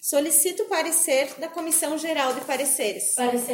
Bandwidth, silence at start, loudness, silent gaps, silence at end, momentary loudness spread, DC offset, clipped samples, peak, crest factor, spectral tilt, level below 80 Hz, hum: 17 kHz; 0 s; -22 LUFS; none; 0 s; 6 LU; under 0.1%; under 0.1%; -8 dBFS; 16 dB; -0.5 dB/octave; -82 dBFS; none